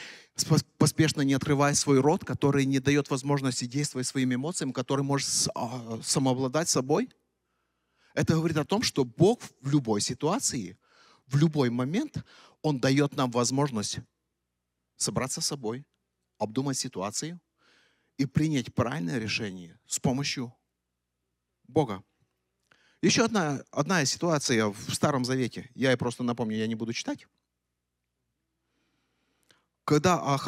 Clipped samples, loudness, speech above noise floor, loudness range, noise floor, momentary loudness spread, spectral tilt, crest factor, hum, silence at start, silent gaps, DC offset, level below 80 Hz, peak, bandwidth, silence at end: under 0.1%; -28 LUFS; 56 dB; 7 LU; -83 dBFS; 11 LU; -4.5 dB/octave; 20 dB; 60 Hz at -60 dBFS; 0 s; none; under 0.1%; -66 dBFS; -10 dBFS; 15.5 kHz; 0 s